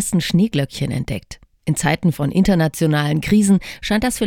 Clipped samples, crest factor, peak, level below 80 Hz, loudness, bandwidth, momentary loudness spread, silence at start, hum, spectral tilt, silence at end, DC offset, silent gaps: under 0.1%; 16 dB; -2 dBFS; -38 dBFS; -18 LUFS; 18 kHz; 8 LU; 0 s; none; -5.5 dB/octave; 0 s; under 0.1%; none